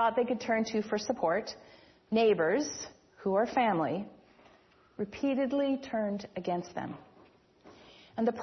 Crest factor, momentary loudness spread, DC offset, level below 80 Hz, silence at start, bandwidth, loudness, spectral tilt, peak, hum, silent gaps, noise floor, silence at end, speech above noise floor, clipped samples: 18 dB; 15 LU; under 0.1%; -70 dBFS; 0 s; 6.4 kHz; -31 LUFS; -5 dB/octave; -14 dBFS; none; none; -62 dBFS; 0 s; 32 dB; under 0.1%